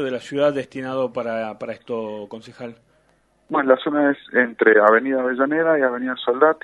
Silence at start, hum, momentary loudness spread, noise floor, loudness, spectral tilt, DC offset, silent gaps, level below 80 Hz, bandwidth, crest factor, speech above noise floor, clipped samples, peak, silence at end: 0 s; none; 18 LU; -61 dBFS; -20 LUFS; -6 dB/octave; under 0.1%; none; -68 dBFS; 10 kHz; 20 dB; 41 dB; under 0.1%; 0 dBFS; 0.1 s